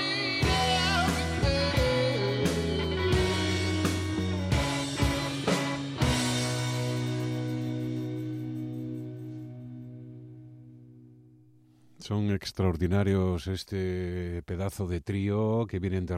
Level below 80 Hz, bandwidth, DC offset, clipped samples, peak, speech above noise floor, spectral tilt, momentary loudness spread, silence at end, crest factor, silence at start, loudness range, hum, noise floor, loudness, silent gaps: -44 dBFS; 15.5 kHz; under 0.1%; under 0.1%; -14 dBFS; 29 dB; -5 dB/octave; 14 LU; 0 s; 16 dB; 0 s; 12 LU; none; -58 dBFS; -29 LUFS; none